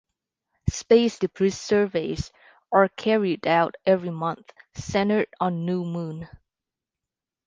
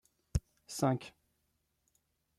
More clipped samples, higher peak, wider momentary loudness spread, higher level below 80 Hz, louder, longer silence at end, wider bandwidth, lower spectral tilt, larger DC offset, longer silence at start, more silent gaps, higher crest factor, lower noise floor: neither; first, -4 dBFS vs -18 dBFS; first, 15 LU vs 12 LU; about the same, -48 dBFS vs -52 dBFS; first, -24 LUFS vs -37 LUFS; second, 1.1 s vs 1.3 s; second, 9.8 kHz vs 14.5 kHz; about the same, -6 dB/octave vs -6 dB/octave; neither; first, 0.65 s vs 0.35 s; neither; about the same, 22 dB vs 22 dB; first, -89 dBFS vs -80 dBFS